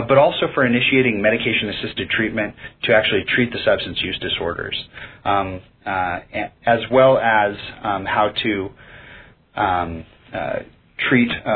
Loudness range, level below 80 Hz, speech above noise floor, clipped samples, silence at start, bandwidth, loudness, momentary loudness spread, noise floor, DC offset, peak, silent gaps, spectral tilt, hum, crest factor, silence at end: 5 LU; -48 dBFS; 25 dB; under 0.1%; 0 s; 4.7 kHz; -19 LUFS; 13 LU; -44 dBFS; under 0.1%; -2 dBFS; none; -8.5 dB/octave; none; 18 dB; 0 s